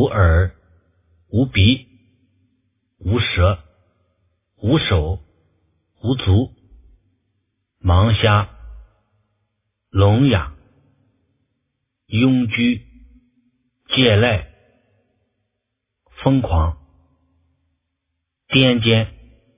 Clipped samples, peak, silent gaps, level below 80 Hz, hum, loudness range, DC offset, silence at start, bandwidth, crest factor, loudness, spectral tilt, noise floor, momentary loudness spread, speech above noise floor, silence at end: under 0.1%; 0 dBFS; none; -30 dBFS; none; 4 LU; under 0.1%; 0 s; 3.8 kHz; 20 dB; -18 LUFS; -10.5 dB/octave; -77 dBFS; 13 LU; 62 dB; 0.45 s